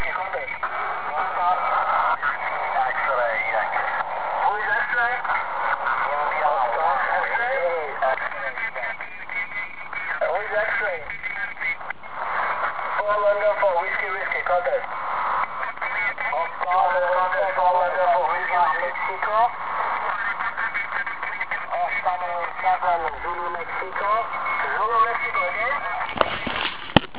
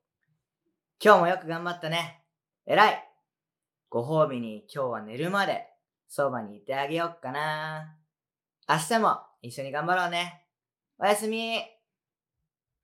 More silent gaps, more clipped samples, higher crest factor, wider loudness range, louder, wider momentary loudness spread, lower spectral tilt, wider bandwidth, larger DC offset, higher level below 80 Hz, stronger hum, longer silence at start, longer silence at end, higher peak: neither; neither; about the same, 24 dB vs 26 dB; about the same, 4 LU vs 5 LU; first, -23 LUFS vs -27 LUFS; second, 7 LU vs 15 LU; first, -7 dB/octave vs -4.5 dB/octave; second, 4 kHz vs 17 kHz; first, 1% vs under 0.1%; first, -54 dBFS vs under -90 dBFS; neither; second, 0 s vs 1 s; second, 0 s vs 1.15 s; first, 0 dBFS vs -4 dBFS